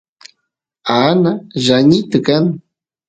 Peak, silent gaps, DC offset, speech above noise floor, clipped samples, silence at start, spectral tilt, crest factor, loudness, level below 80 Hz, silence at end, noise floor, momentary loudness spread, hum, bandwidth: 0 dBFS; none; under 0.1%; 62 dB; under 0.1%; 0.85 s; -6 dB/octave; 14 dB; -13 LUFS; -52 dBFS; 0.5 s; -74 dBFS; 8 LU; none; 9.2 kHz